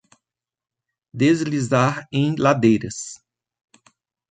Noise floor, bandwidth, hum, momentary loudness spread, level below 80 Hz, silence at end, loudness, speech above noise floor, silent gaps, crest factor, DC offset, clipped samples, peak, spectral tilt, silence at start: -89 dBFS; 9.4 kHz; none; 15 LU; -58 dBFS; 1.15 s; -20 LUFS; 70 dB; none; 20 dB; under 0.1%; under 0.1%; -4 dBFS; -6 dB/octave; 1.15 s